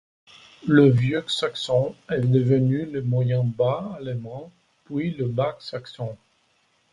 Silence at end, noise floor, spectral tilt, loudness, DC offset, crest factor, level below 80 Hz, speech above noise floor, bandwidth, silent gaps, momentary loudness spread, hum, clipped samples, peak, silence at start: 0.8 s; -66 dBFS; -7.5 dB/octave; -23 LUFS; under 0.1%; 20 dB; -58 dBFS; 43 dB; 10.5 kHz; none; 16 LU; none; under 0.1%; -4 dBFS; 0.65 s